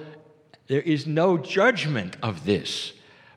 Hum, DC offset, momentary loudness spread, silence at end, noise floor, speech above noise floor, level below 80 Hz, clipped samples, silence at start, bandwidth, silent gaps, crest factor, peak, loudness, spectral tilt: none; under 0.1%; 10 LU; 0.45 s; -55 dBFS; 31 dB; -66 dBFS; under 0.1%; 0 s; 12 kHz; none; 20 dB; -6 dBFS; -24 LUFS; -5.5 dB/octave